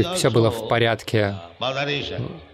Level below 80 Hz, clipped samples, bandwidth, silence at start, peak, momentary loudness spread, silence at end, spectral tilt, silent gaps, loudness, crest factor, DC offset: -52 dBFS; under 0.1%; 15 kHz; 0 s; -6 dBFS; 9 LU; 0.1 s; -5 dB/octave; none; -22 LUFS; 16 dB; under 0.1%